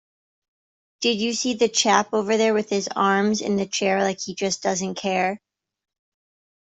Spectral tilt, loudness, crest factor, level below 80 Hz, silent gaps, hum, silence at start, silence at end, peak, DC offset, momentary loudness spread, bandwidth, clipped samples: -3 dB/octave; -22 LUFS; 22 dB; -66 dBFS; none; none; 1 s; 1.25 s; -2 dBFS; under 0.1%; 6 LU; 8.2 kHz; under 0.1%